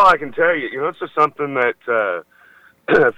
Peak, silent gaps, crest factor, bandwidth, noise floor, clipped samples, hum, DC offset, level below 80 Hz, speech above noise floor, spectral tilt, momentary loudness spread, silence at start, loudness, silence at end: -4 dBFS; none; 14 dB; 10.5 kHz; -50 dBFS; under 0.1%; none; under 0.1%; -52 dBFS; 32 dB; -6 dB/octave; 8 LU; 0 s; -18 LUFS; 0.05 s